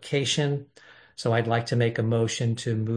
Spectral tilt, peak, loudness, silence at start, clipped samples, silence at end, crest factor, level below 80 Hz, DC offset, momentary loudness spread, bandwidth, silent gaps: -5 dB/octave; -8 dBFS; -26 LUFS; 0 s; under 0.1%; 0 s; 16 dB; -64 dBFS; under 0.1%; 7 LU; 10.5 kHz; none